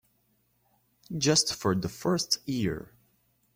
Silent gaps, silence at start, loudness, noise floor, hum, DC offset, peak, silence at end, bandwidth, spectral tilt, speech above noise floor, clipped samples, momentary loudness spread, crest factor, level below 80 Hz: none; 1.1 s; -28 LUFS; -71 dBFS; none; under 0.1%; -8 dBFS; 0.7 s; 16.5 kHz; -3.5 dB/octave; 43 dB; under 0.1%; 10 LU; 22 dB; -60 dBFS